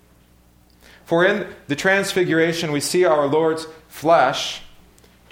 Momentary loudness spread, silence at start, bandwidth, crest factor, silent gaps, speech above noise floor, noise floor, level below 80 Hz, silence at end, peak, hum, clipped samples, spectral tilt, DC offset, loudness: 11 LU; 1.1 s; 17 kHz; 18 dB; none; 35 dB; -53 dBFS; -56 dBFS; 0.65 s; -2 dBFS; none; under 0.1%; -4 dB/octave; under 0.1%; -19 LUFS